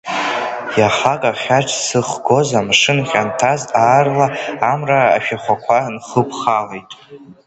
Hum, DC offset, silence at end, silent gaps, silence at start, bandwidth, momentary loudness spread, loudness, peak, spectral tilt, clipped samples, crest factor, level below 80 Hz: none; under 0.1%; 0.15 s; none; 0.05 s; 8.8 kHz; 7 LU; -15 LUFS; 0 dBFS; -4 dB/octave; under 0.1%; 16 dB; -54 dBFS